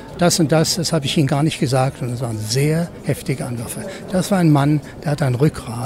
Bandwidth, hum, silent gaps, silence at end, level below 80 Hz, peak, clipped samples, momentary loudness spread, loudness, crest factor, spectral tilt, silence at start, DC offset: 16 kHz; none; none; 0 s; -44 dBFS; -4 dBFS; under 0.1%; 10 LU; -19 LUFS; 14 dB; -5.5 dB/octave; 0 s; under 0.1%